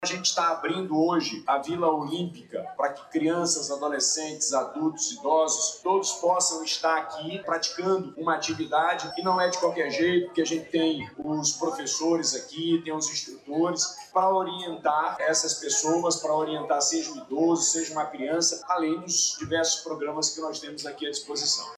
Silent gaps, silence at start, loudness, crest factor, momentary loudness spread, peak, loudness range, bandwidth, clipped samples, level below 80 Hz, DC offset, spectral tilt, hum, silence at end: none; 0 s; -26 LUFS; 16 dB; 7 LU; -12 dBFS; 2 LU; 13.5 kHz; under 0.1%; -70 dBFS; under 0.1%; -2.5 dB/octave; none; 0 s